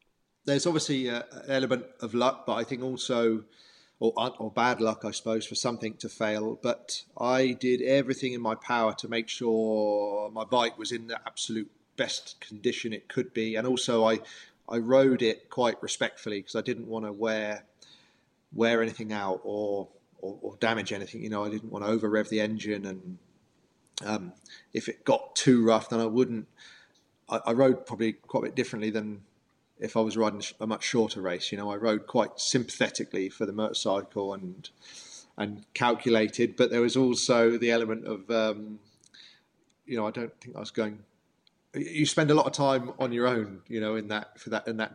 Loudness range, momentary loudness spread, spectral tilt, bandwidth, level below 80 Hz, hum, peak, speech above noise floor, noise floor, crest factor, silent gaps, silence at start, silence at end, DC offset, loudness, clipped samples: 6 LU; 13 LU; -4.5 dB/octave; 11.5 kHz; -78 dBFS; none; -10 dBFS; 41 dB; -69 dBFS; 20 dB; none; 0.45 s; 0 s; under 0.1%; -29 LUFS; under 0.1%